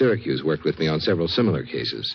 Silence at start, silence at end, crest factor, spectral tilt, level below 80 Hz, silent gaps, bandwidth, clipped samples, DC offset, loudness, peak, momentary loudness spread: 0 s; 0 s; 14 dB; -7.5 dB/octave; -50 dBFS; none; 6.6 kHz; under 0.1%; under 0.1%; -23 LUFS; -8 dBFS; 5 LU